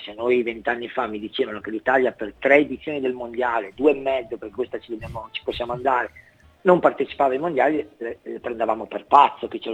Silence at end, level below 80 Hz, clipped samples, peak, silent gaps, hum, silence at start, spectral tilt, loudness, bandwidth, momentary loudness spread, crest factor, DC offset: 0 s; -54 dBFS; under 0.1%; 0 dBFS; none; none; 0 s; -6.5 dB/octave; -22 LUFS; 8.8 kHz; 14 LU; 22 dB; under 0.1%